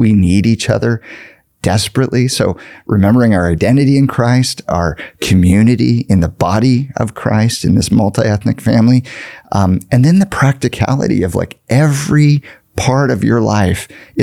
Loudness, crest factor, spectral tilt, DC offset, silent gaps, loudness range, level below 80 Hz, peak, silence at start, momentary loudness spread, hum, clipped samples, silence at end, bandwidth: -13 LUFS; 12 dB; -6.5 dB/octave; 0.2%; none; 2 LU; -38 dBFS; 0 dBFS; 0 s; 8 LU; none; under 0.1%; 0 s; 15 kHz